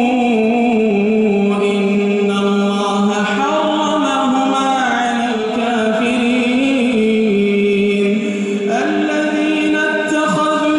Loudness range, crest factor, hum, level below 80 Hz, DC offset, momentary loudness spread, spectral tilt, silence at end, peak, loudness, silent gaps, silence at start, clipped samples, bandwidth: 1 LU; 10 dB; none; -56 dBFS; under 0.1%; 2 LU; -5.5 dB/octave; 0 s; -4 dBFS; -15 LUFS; none; 0 s; under 0.1%; 11.5 kHz